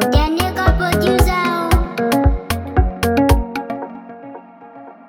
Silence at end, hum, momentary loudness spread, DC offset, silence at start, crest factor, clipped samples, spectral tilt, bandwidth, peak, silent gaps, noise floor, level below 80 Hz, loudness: 0.15 s; none; 19 LU; under 0.1%; 0 s; 16 dB; under 0.1%; -6 dB/octave; 18.5 kHz; 0 dBFS; none; -38 dBFS; -22 dBFS; -17 LUFS